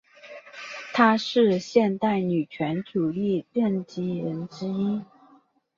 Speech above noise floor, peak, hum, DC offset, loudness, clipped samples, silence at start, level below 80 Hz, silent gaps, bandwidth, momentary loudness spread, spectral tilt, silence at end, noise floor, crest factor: 35 dB; -4 dBFS; none; under 0.1%; -25 LUFS; under 0.1%; 0.25 s; -68 dBFS; none; 7.4 kHz; 16 LU; -6.5 dB/octave; 0.75 s; -59 dBFS; 20 dB